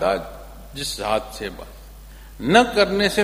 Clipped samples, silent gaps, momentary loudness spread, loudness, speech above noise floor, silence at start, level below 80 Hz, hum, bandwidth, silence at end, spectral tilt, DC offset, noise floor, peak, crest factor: under 0.1%; none; 23 LU; -20 LUFS; 20 dB; 0 s; -40 dBFS; none; 15.5 kHz; 0 s; -4 dB/octave; under 0.1%; -40 dBFS; 0 dBFS; 22 dB